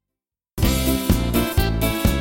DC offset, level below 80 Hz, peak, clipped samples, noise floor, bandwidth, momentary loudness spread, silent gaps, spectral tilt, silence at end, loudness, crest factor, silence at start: under 0.1%; -26 dBFS; -4 dBFS; under 0.1%; -87 dBFS; 17 kHz; 3 LU; none; -5 dB/octave; 0 s; -21 LUFS; 16 dB; 0.55 s